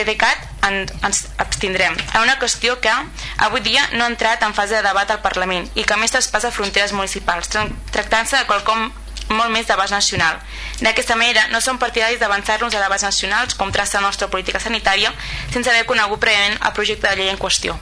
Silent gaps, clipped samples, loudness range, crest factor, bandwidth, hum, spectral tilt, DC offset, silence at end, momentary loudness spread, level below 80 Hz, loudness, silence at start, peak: none; under 0.1%; 2 LU; 16 dB; 11 kHz; none; -1.5 dB/octave; under 0.1%; 0 s; 6 LU; -36 dBFS; -17 LUFS; 0 s; -2 dBFS